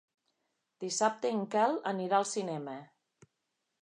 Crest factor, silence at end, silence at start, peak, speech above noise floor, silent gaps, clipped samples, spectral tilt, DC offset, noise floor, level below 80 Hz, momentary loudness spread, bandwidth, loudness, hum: 20 dB; 1 s; 0.8 s; -14 dBFS; 52 dB; none; under 0.1%; -4 dB/octave; under 0.1%; -84 dBFS; -88 dBFS; 13 LU; 11 kHz; -32 LUFS; none